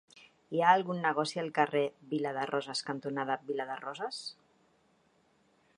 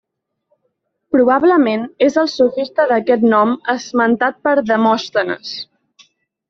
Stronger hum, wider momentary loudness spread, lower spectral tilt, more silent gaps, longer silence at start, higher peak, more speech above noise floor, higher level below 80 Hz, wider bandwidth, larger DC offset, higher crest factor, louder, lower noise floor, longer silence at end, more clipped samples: neither; first, 12 LU vs 8 LU; about the same, -4.5 dB/octave vs -5 dB/octave; neither; second, 0.15 s vs 1.1 s; second, -10 dBFS vs -2 dBFS; second, 38 dB vs 55 dB; second, -84 dBFS vs -60 dBFS; first, 11 kHz vs 7.4 kHz; neither; first, 24 dB vs 14 dB; second, -32 LUFS vs -15 LUFS; about the same, -70 dBFS vs -69 dBFS; first, 1.45 s vs 0.85 s; neither